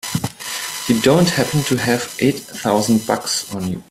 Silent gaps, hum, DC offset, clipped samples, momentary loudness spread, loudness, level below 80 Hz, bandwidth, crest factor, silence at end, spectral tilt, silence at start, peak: none; none; under 0.1%; under 0.1%; 10 LU; -18 LUFS; -50 dBFS; 16 kHz; 18 dB; 0.1 s; -4.5 dB/octave; 0.05 s; 0 dBFS